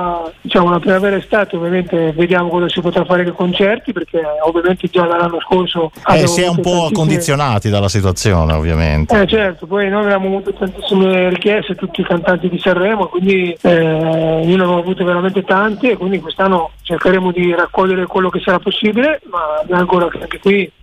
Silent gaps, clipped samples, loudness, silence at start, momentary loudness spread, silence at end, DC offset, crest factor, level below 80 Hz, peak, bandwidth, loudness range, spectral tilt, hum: none; under 0.1%; -14 LUFS; 0 s; 5 LU; 0.15 s; under 0.1%; 12 dB; -32 dBFS; -2 dBFS; 14.5 kHz; 1 LU; -5.5 dB/octave; none